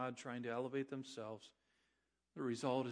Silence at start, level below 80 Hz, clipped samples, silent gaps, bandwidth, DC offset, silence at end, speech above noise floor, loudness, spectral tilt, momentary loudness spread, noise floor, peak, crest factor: 0 s; under -90 dBFS; under 0.1%; none; 10.5 kHz; under 0.1%; 0 s; 42 dB; -44 LUFS; -5.5 dB/octave; 16 LU; -85 dBFS; -26 dBFS; 18 dB